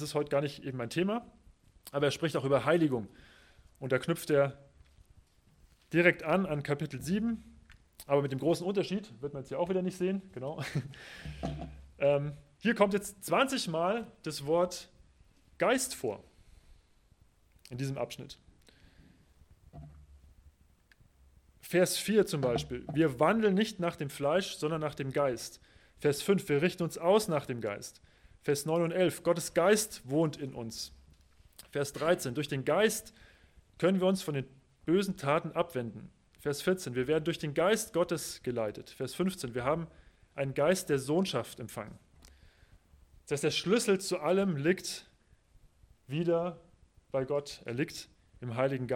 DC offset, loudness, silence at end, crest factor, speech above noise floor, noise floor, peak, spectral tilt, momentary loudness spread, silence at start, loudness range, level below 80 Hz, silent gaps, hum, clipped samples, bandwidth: under 0.1%; -32 LUFS; 0 s; 24 dB; 34 dB; -65 dBFS; -8 dBFS; -5 dB/octave; 14 LU; 0 s; 6 LU; -60 dBFS; none; none; under 0.1%; 17 kHz